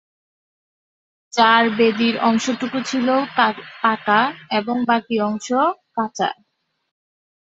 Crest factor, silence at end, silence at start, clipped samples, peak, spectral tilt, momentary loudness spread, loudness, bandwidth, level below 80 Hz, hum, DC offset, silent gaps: 18 dB; 1.25 s; 1.35 s; under 0.1%; -2 dBFS; -4 dB/octave; 10 LU; -19 LUFS; 8 kHz; -66 dBFS; none; under 0.1%; none